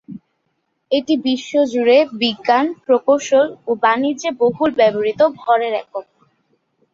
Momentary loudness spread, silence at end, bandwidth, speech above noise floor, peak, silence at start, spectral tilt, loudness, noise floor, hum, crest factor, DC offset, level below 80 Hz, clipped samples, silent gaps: 7 LU; 0.95 s; 7.6 kHz; 53 dB; -2 dBFS; 0.1 s; -4 dB/octave; -17 LUFS; -70 dBFS; none; 16 dB; under 0.1%; -62 dBFS; under 0.1%; none